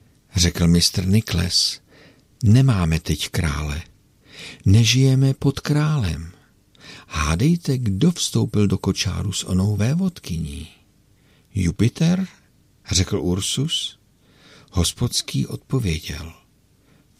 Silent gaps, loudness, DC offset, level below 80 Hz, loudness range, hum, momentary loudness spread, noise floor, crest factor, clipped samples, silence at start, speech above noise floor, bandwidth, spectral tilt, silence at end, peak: none; -20 LUFS; under 0.1%; -38 dBFS; 5 LU; none; 14 LU; -57 dBFS; 16 dB; under 0.1%; 0.35 s; 38 dB; 15.5 kHz; -5 dB/octave; 0.85 s; -4 dBFS